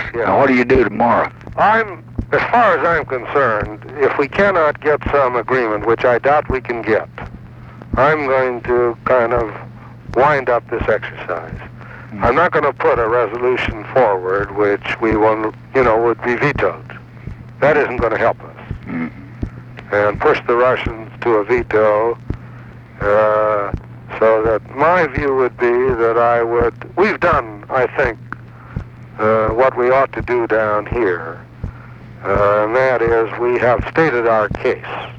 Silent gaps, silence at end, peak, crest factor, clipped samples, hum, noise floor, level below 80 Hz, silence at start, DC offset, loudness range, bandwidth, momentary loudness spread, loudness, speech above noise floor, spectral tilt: none; 0 s; -2 dBFS; 14 dB; under 0.1%; none; -36 dBFS; -36 dBFS; 0 s; under 0.1%; 3 LU; 7.6 kHz; 17 LU; -16 LUFS; 20 dB; -7.5 dB/octave